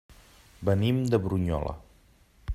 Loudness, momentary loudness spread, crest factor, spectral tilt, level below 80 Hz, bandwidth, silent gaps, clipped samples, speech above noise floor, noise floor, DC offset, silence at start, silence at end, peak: -28 LUFS; 15 LU; 20 dB; -8 dB/octave; -46 dBFS; 15 kHz; none; under 0.1%; 34 dB; -59 dBFS; under 0.1%; 0.1 s; 0 s; -10 dBFS